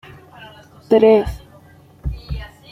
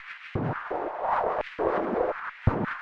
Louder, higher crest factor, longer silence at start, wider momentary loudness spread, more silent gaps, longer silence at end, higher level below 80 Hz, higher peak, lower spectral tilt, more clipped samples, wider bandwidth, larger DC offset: first, -15 LUFS vs -29 LUFS; about the same, 18 dB vs 20 dB; first, 0.4 s vs 0 s; first, 19 LU vs 5 LU; neither; first, 0.25 s vs 0 s; first, -34 dBFS vs -46 dBFS; first, -2 dBFS vs -8 dBFS; about the same, -8 dB/octave vs -9 dB/octave; neither; first, 10.5 kHz vs 7 kHz; neither